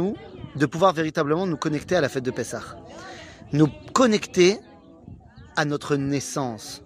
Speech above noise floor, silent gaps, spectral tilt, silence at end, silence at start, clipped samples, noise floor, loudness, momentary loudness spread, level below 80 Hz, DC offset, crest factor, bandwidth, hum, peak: 22 dB; none; -5 dB/octave; 0.05 s; 0 s; under 0.1%; -45 dBFS; -23 LUFS; 18 LU; -54 dBFS; under 0.1%; 20 dB; 15.5 kHz; none; -4 dBFS